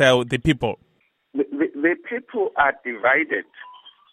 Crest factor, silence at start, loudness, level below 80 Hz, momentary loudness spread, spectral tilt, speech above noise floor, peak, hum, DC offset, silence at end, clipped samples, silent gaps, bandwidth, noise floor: 20 dB; 0 s; -22 LUFS; -48 dBFS; 17 LU; -5.5 dB/octave; 45 dB; -2 dBFS; none; under 0.1%; 0.25 s; under 0.1%; none; 12.5 kHz; -66 dBFS